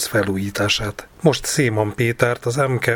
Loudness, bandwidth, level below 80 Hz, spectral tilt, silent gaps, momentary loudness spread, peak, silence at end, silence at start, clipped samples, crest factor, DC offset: -20 LUFS; 19.5 kHz; -44 dBFS; -4.5 dB/octave; none; 3 LU; 0 dBFS; 0 s; 0 s; under 0.1%; 20 dB; under 0.1%